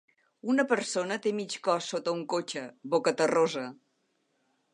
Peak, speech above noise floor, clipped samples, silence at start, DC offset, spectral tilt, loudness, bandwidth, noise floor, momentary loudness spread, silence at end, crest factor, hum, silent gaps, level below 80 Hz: -10 dBFS; 46 dB; under 0.1%; 0.45 s; under 0.1%; -4 dB/octave; -29 LUFS; 11 kHz; -75 dBFS; 12 LU; 1 s; 20 dB; none; none; -84 dBFS